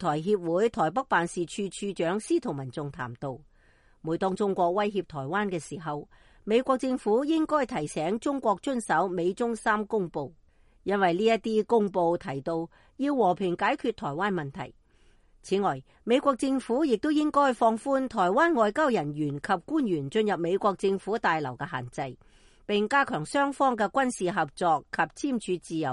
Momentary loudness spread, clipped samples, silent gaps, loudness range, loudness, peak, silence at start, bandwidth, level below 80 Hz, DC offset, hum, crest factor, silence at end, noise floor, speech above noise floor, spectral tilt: 11 LU; under 0.1%; none; 5 LU; -27 LUFS; -10 dBFS; 0 s; 11.5 kHz; -60 dBFS; under 0.1%; none; 18 dB; 0 s; -60 dBFS; 33 dB; -5.5 dB/octave